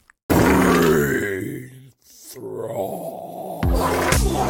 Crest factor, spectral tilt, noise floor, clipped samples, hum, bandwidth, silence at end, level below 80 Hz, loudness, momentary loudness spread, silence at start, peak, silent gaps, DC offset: 20 dB; -5.5 dB/octave; -46 dBFS; under 0.1%; none; 17 kHz; 0 s; -30 dBFS; -20 LUFS; 18 LU; 0.3 s; -2 dBFS; none; under 0.1%